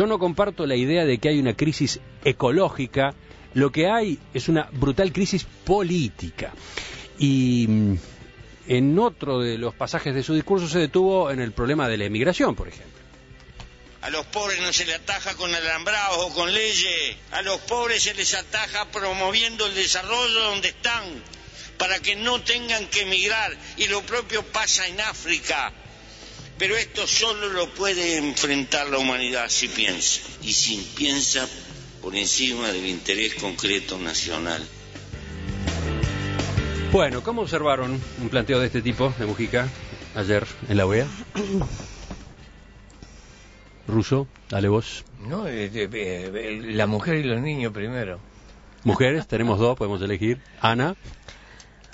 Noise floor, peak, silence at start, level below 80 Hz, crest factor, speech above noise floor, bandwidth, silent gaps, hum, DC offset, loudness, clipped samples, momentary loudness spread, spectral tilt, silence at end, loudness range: -47 dBFS; -2 dBFS; 0 s; -44 dBFS; 22 dB; 24 dB; 8 kHz; none; none; under 0.1%; -23 LUFS; under 0.1%; 12 LU; -3.5 dB/octave; 0.3 s; 5 LU